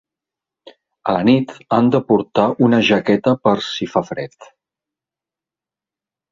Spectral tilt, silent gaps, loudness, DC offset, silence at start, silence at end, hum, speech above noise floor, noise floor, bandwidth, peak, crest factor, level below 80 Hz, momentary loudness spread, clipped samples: -6.5 dB/octave; none; -16 LUFS; under 0.1%; 0.65 s; 1.9 s; none; 73 dB; -89 dBFS; 7.6 kHz; -2 dBFS; 16 dB; -56 dBFS; 10 LU; under 0.1%